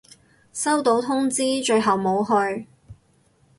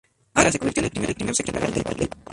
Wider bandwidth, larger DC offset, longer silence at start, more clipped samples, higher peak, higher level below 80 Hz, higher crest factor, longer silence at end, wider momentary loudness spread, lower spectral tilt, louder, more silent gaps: about the same, 12 kHz vs 11.5 kHz; neither; first, 0.55 s vs 0.35 s; neither; second, -8 dBFS vs 0 dBFS; second, -60 dBFS vs -44 dBFS; second, 16 dB vs 24 dB; first, 0.65 s vs 0 s; about the same, 7 LU vs 7 LU; about the same, -3.5 dB/octave vs -4 dB/octave; about the same, -21 LUFS vs -23 LUFS; neither